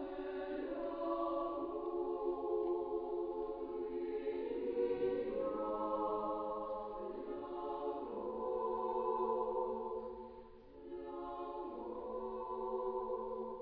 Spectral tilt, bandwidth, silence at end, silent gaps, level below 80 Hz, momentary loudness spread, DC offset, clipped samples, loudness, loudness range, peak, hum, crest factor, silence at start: -5.5 dB/octave; 5 kHz; 0 s; none; -64 dBFS; 8 LU; under 0.1%; under 0.1%; -41 LUFS; 4 LU; -26 dBFS; none; 14 dB; 0 s